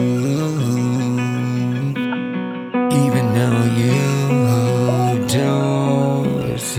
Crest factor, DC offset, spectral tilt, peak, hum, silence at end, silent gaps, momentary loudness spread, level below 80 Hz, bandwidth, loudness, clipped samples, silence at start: 14 dB; under 0.1%; -6.5 dB/octave; -4 dBFS; none; 0 s; none; 5 LU; -52 dBFS; 16 kHz; -18 LUFS; under 0.1%; 0 s